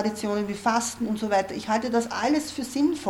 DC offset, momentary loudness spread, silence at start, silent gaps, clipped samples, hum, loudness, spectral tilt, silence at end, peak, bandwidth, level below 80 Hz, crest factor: under 0.1%; 3 LU; 0 s; none; under 0.1%; none; -26 LUFS; -4 dB/octave; 0 s; -10 dBFS; 16.5 kHz; -58 dBFS; 16 dB